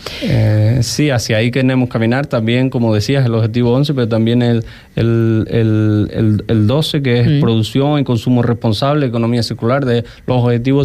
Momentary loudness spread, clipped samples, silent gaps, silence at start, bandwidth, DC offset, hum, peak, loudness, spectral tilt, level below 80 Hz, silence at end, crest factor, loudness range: 3 LU; under 0.1%; none; 0 s; 14 kHz; under 0.1%; none; -4 dBFS; -14 LUFS; -7 dB/octave; -40 dBFS; 0 s; 10 dB; 1 LU